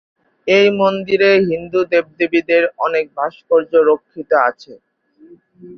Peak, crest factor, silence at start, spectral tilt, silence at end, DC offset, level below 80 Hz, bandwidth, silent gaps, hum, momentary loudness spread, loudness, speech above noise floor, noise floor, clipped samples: -2 dBFS; 14 dB; 0.45 s; -6 dB/octave; 0 s; under 0.1%; -60 dBFS; 6.4 kHz; none; none; 7 LU; -15 LUFS; 31 dB; -46 dBFS; under 0.1%